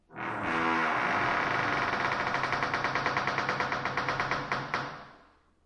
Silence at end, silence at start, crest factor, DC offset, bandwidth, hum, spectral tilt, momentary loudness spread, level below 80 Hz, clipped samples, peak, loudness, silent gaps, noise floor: 0.5 s; 0.1 s; 18 dB; under 0.1%; 11.5 kHz; none; -4.5 dB/octave; 7 LU; -58 dBFS; under 0.1%; -12 dBFS; -29 LUFS; none; -61 dBFS